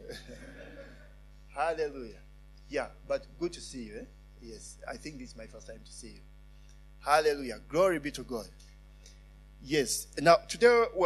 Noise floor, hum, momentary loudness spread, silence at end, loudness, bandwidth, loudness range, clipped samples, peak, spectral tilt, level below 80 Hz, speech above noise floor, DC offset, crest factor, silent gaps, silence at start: -53 dBFS; none; 24 LU; 0 s; -30 LUFS; 13.5 kHz; 13 LU; under 0.1%; -8 dBFS; -3.5 dB/octave; -52 dBFS; 22 dB; under 0.1%; 24 dB; none; 0 s